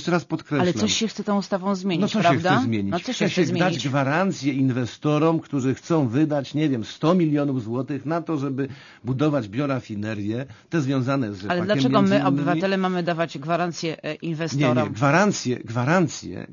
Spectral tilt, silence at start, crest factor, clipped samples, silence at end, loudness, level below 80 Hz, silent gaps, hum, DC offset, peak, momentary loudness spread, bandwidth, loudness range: -6 dB/octave; 0 s; 18 dB; under 0.1%; 0 s; -23 LUFS; -64 dBFS; none; none; under 0.1%; -4 dBFS; 8 LU; 7.4 kHz; 4 LU